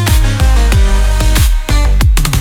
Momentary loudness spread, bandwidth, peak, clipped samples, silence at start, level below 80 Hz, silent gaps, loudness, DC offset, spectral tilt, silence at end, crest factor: 2 LU; 17 kHz; 0 dBFS; under 0.1%; 0 s; -10 dBFS; none; -12 LUFS; under 0.1%; -4.5 dB/octave; 0 s; 8 dB